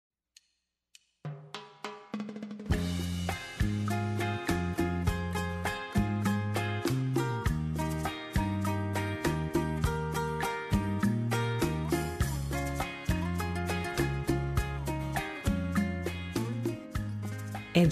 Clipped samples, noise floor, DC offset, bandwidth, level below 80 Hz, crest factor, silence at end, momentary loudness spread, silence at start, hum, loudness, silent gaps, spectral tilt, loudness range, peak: under 0.1%; -80 dBFS; under 0.1%; 14 kHz; -42 dBFS; 20 dB; 0 s; 8 LU; 1.25 s; none; -32 LUFS; none; -6 dB/octave; 3 LU; -12 dBFS